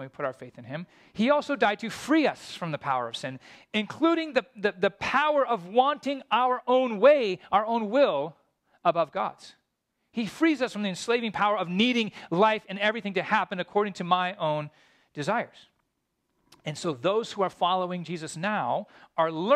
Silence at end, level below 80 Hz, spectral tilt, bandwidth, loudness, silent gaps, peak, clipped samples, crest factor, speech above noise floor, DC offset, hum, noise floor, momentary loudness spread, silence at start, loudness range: 0 s; -70 dBFS; -5 dB/octave; 13.5 kHz; -27 LUFS; none; -8 dBFS; under 0.1%; 20 dB; 52 dB; under 0.1%; none; -78 dBFS; 12 LU; 0 s; 6 LU